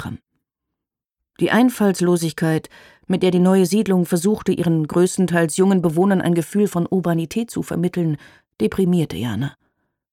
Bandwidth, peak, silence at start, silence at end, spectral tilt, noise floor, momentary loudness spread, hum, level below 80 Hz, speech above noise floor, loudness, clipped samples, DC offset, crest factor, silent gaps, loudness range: 16 kHz; -4 dBFS; 0 s; 0.6 s; -6.5 dB/octave; -83 dBFS; 8 LU; none; -54 dBFS; 65 dB; -19 LUFS; under 0.1%; under 0.1%; 16 dB; none; 4 LU